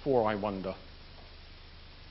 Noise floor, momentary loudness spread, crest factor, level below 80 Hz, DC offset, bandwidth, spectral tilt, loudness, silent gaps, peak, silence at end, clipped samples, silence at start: -50 dBFS; 23 LU; 20 dB; -54 dBFS; under 0.1%; 5.6 kHz; -5 dB/octave; -33 LUFS; none; -14 dBFS; 0 s; under 0.1%; 0 s